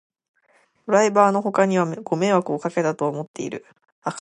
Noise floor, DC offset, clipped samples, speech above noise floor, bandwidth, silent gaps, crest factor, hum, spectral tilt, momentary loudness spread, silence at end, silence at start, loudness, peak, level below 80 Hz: -62 dBFS; under 0.1%; under 0.1%; 41 dB; 11 kHz; 3.28-3.34 s, 3.92-4.02 s; 20 dB; none; -6 dB/octave; 15 LU; 0 s; 0.85 s; -21 LUFS; -2 dBFS; -72 dBFS